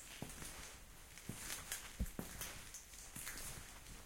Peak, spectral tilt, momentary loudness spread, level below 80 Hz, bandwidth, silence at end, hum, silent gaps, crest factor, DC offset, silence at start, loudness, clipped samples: -26 dBFS; -2.5 dB/octave; 8 LU; -56 dBFS; 16.5 kHz; 0 s; none; none; 24 dB; under 0.1%; 0 s; -49 LUFS; under 0.1%